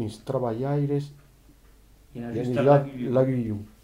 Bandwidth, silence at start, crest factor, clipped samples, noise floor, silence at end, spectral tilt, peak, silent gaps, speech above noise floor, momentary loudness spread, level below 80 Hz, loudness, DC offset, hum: 11.5 kHz; 0 s; 20 dB; under 0.1%; -54 dBFS; 0.15 s; -9 dB/octave; -6 dBFS; none; 29 dB; 15 LU; -56 dBFS; -25 LUFS; under 0.1%; none